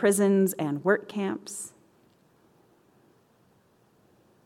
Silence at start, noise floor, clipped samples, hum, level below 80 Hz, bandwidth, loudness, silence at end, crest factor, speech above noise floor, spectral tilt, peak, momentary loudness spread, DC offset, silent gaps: 0 s; -64 dBFS; under 0.1%; none; -76 dBFS; 16.5 kHz; -27 LUFS; 2.75 s; 20 dB; 38 dB; -5.5 dB/octave; -10 dBFS; 16 LU; under 0.1%; none